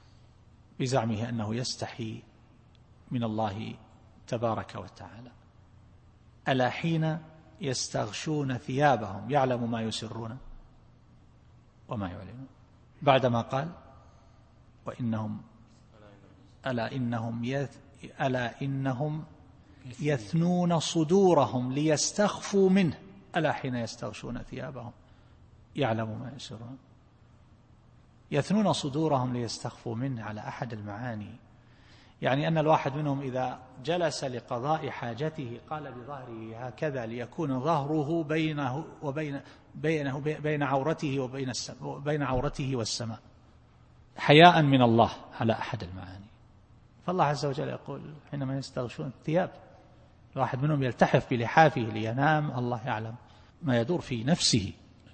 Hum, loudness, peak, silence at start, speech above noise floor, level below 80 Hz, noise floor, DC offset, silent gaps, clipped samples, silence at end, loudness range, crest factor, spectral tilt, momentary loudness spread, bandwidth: none; -29 LUFS; -2 dBFS; 0.8 s; 29 dB; -58 dBFS; -58 dBFS; under 0.1%; none; under 0.1%; 0.4 s; 11 LU; 28 dB; -5.5 dB/octave; 17 LU; 8.8 kHz